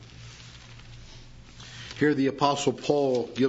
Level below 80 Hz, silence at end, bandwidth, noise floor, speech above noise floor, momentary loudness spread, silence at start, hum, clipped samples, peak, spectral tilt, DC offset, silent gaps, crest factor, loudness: -54 dBFS; 0 s; 8 kHz; -47 dBFS; 22 dB; 23 LU; 0 s; none; under 0.1%; -8 dBFS; -5 dB/octave; under 0.1%; none; 20 dB; -25 LUFS